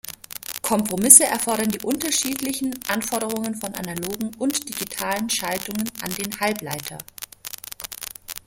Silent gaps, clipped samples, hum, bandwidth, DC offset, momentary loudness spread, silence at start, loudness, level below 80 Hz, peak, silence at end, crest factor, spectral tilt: none; under 0.1%; none; 17 kHz; under 0.1%; 13 LU; 0.05 s; -21 LUFS; -58 dBFS; 0 dBFS; 0.1 s; 24 dB; -2 dB/octave